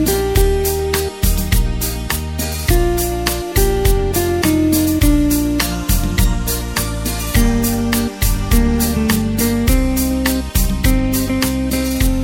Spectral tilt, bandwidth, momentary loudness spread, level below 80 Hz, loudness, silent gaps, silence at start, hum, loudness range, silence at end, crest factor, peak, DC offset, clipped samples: -5 dB/octave; 17 kHz; 5 LU; -20 dBFS; -17 LUFS; none; 0 s; none; 2 LU; 0 s; 16 dB; 0 dBFS; under 0.1%; under 0.1%